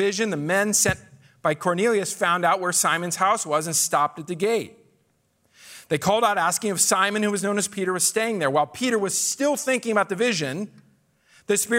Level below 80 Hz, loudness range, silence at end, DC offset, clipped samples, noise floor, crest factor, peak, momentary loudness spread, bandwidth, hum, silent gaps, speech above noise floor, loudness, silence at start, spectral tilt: -62 dBFS; 2 LU; 0 s; under 0.1%; under 0.1%; -67 dBFS; 18 dB; -6 dBFS; 6 LU; 16 kHz; none; none; 44 dB; -22 LUFS; 0 s; -3 dB/octave